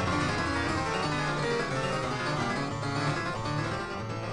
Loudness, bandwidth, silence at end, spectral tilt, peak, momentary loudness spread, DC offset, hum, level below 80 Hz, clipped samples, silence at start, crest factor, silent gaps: -30 LUFS; 11.5 kHz; 0 s; -5 dB/octave; -16 dBFS; 3 LU; under 0.1%; none; -48 dBFS; under 0.1%; 0 s; 14 dB; none